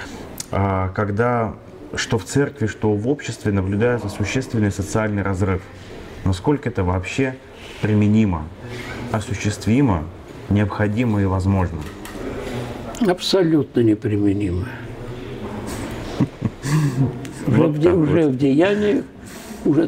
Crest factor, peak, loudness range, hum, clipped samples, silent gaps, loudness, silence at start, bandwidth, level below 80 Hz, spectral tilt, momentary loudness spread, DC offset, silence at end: 16 dB; -4 dBFS; 4 LU; none; under 0.1%; none; -20 LUFS; 0 s; 16 kHz; -42 dBFS; -6.5 dB/octave; 15 LU; under 0.1%; 0 s